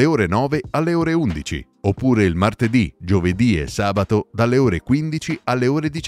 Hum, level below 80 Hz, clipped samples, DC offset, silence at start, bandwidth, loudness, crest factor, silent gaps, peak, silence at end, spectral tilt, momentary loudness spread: none; -38 dBFS; under 0.1%; under 0.1%; 0 s; 14 kHz; -19 LUFS; 16 dB; none; -2 dBFS; 0 s; -7 dB/octave; 7 LU